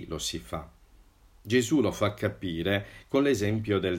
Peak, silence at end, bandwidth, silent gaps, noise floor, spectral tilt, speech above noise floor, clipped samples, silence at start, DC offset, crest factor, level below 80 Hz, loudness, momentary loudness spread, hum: -12 dBFS; 0 s; 16 kHz; none; -57 dBFS; -5 dB/octave; 30 dB; under 0.1%; 0 s; under 0.1%; 18 dB; -52 dBFS; -28 LUFS; 8 LU; none